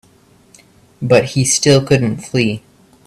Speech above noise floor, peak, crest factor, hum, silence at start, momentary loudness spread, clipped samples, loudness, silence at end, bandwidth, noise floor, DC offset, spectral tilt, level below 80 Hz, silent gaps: 36 dB; 0 dBFS; 16 dB; none; 1 s; 9 LU; under 0.1%; -14 LUFS; 0.5 s; 14 kHz; -50 dBFS; under 0.1%; -4.5 dB/octave; -46 dBFS; none